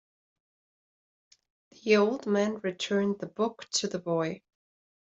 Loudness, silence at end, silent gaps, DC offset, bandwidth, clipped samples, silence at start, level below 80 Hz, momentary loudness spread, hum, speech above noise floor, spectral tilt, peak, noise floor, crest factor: -29 LUFS; 0.65 s; none; under 0.1%; 8.2 kHz; under 0.1%; 1.85 s; -76 dBFS; 9 LU; none; over 62 dB; -4.5 dB/octave; -10 dBFS; under -90 dBFS; 22 dB